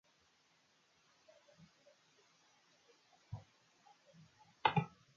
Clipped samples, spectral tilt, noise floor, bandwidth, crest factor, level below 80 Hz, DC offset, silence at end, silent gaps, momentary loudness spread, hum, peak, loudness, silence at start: under 0.1%; -3.5 dB/octave; -74 dBFS; 7.2 kHz; 32 dB; -74 dBFS; under 0.1%; 0.3 s; none; 29 LU; none; -16 dBFS; -40 LUFS; 3.3 s